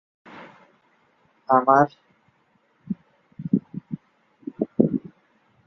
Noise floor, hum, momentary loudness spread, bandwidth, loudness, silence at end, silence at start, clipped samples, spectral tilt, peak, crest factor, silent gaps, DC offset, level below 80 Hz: -65 dBFS; none; 26 LU; 6.2 kHz; -23 LUFS; 0.65 s; 0.35 s; under 0.1%; -9.5 dB/octave; -2 dBFS; 24 dB; none; under 0.1%; -64 dBFS